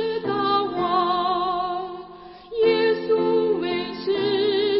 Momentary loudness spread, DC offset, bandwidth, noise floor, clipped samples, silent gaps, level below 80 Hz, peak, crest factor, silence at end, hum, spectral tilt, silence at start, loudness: 12 LU; under 0.1%; 5.8 kHz; -42 dBFS; under 0.1%; none; -58 dBFS; -8 dBFS; 14 dB; 0 s; none; -9.5 dB/octave; 0 s; -22 LUFS